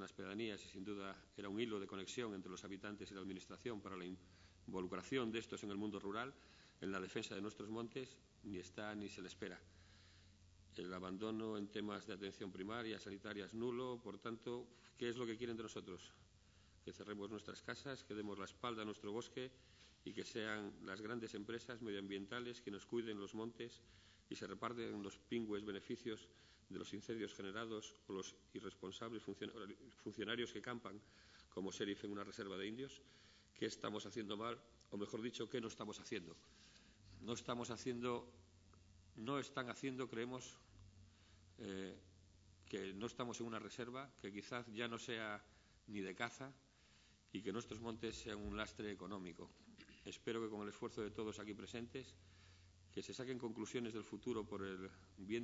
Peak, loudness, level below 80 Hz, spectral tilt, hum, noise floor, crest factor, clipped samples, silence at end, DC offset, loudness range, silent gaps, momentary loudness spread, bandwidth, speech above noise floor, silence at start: -26 dBFS; -49 LUFS; -74 dBFS; -4 dB/octave; none; -71 dBFS; 24 dB; under 0.1%; 0 s; under 0.1%; 3 LU; none; 18 LU; 7.6 kHz; 22 dB; 0 s